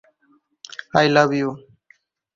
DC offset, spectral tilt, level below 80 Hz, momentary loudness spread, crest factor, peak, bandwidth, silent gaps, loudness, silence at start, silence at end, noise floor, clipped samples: under 0.1%; -5.5 dB/octave; -62 dBFS; 21 LU; 20 dB; -2 dBFS; 7.6 kHz; none; -18 LUFS; 0.95 s; 0.8 s; -62 dBFS; under 0.1%